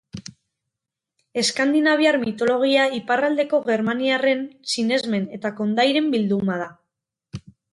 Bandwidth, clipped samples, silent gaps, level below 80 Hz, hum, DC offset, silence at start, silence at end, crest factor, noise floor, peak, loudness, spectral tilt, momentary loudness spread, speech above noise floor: 11.5 kHz; under 0.1%; none; -62 dBFS; none; under 0.1%; 0.15 s; 0.35 s; 16 dB; -85 dBFS; -6 dBFS; -21 LUFS; -4.5 dB/octave; 16 LU; 64 dB